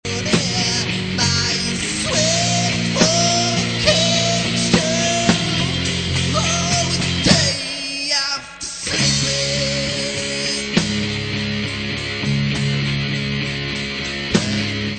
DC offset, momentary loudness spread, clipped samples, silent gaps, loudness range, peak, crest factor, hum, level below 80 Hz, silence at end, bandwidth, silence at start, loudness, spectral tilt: under 0.1%; 7 LU; under 0.1%; none; 5 LU; 0 dBFS; 20 dB; none; -40 dBFS; 0 s; 9.2 kHz; 0.05 s; -18 LUFS; -3.5 dB/octave